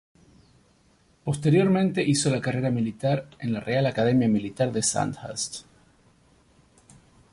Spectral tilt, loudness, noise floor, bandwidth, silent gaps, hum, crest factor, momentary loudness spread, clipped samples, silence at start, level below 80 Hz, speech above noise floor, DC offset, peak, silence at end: -5.5 dB/octave; -25 LUFS; -62 dBFS; 11.5 kHz; none; none; 16 dB; 10 LU; under 0.1%; 1.25 s; -58 dBFS; 38 dB; under 0.1%; -10 dBFS; 1.7 s